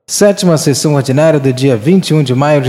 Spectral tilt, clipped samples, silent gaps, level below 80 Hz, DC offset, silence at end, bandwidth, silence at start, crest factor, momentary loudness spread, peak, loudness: -5.5 dB/octave; 0.3%; none; -54 dBFS; under 0.1%; 0 s; 15.5 kHz; 0.1 s; 10 dB; 2 LU; 0 dBFS; -10 LUFS